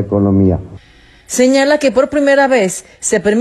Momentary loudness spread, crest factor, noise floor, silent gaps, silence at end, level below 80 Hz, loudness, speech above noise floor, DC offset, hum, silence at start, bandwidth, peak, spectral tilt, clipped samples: 9 LU; 12 dB; -44 dBFS; none; 0 s; -44 dBFS; -13 LUFS; 32 dB; under 0.1%; none; 0 s; 13.5 kHz; 0 dBFS; -5 dB/octave; under 0.1%